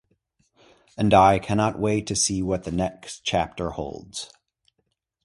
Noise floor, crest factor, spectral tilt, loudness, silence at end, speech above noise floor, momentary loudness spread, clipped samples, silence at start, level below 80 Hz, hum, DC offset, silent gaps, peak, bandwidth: -75 dBFS; 22 dB; -4.5 dB/octave; -23 LUFS; 1 s; 53 dB; 18 LU; under 0.1%; 1 s; -46 dBFS; none; under 0.1%; none; -4 dBFS; 11.5 kHz